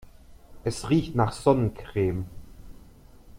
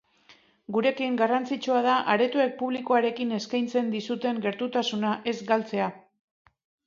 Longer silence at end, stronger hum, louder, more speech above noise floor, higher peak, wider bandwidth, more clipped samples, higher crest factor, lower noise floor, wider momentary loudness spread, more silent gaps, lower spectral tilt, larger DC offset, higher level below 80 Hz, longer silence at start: second, 0 s vs 0.85 s; neither; about the same, -26 LUFS vs -26 LUFS; second, 25 dB vs 33 dB; about the same, -8 dBFS vs -8 dBFS; first, 15.5 kHz vs 7.4 kHz; neither; about the same, 20 dB vs 18 dB; second, -50 dBFS vs -59 dBFS; first, 11 LU vs 7 LU; neither; first, -7 dB/octave vs -5 dB/octave; neither; first, -46 dBFS vs -76 dBFS; about the same, 0.3 s vs 0.3 s